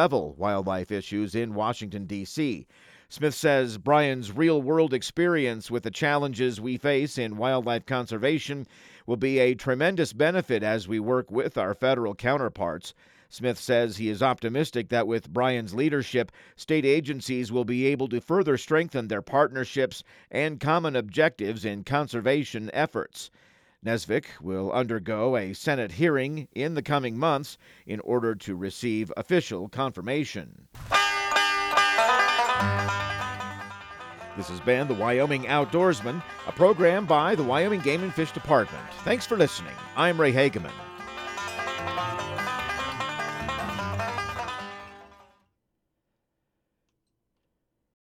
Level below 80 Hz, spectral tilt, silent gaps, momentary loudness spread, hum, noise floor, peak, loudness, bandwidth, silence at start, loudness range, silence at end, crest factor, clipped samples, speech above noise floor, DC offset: -60 dBFS; -5.5 dB/octave; none; 12 LU; none; -80 dBFS; -6 dBFS; -26 LUFS; 16 kHz; 0 s; 6 LU; 3.05 s; 20 dB; under 0.1%; 54 dB; under 0.1%